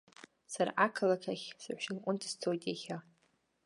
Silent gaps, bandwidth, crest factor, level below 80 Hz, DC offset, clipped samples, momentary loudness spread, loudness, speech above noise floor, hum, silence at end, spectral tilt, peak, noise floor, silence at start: none; 11.5 kHz; 24 dB; -86 dBFS; under 0.1%; under 0.1%; 13 LU; -36 LUFS; 40 dB; none; 0.65 s; -4 dB/octave; -14 dBFS; -76 dBFS; 0.5 s